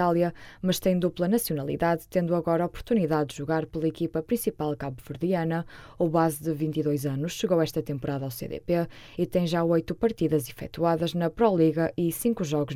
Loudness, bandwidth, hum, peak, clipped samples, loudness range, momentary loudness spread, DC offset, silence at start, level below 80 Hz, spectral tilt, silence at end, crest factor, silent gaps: -27 LUFS; 16.5 kHz; none; -8 dBFS; under 0.1%; 3 LU; 7 LU; under 0.1%; 0 s; -52 dBFS; -6.5 dB/octave; 0 s; 18 dB; none